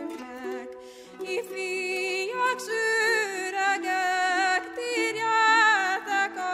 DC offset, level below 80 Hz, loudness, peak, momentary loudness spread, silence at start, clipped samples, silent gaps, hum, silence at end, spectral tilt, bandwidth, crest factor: under 0.1%; -74 dBFS; -25 LUFS; -10 dBFS; 17 LU; 0 s; under 0.1%; none; none; 0 s; -1 dB/octave; 16 kHz; 16 dB